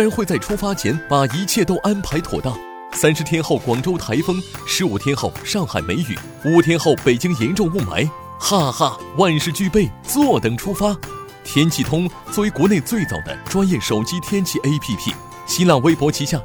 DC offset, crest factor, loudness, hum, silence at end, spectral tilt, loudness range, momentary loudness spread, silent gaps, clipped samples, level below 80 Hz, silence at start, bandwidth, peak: under 0.1%; 16 dB; -19 LUFS; none; 0 s; -5 dB/octave; 2 LU; 8 LU; none; under 0.1%; -40 dBFS; 0 s; over 20 kHz; -2 dBFS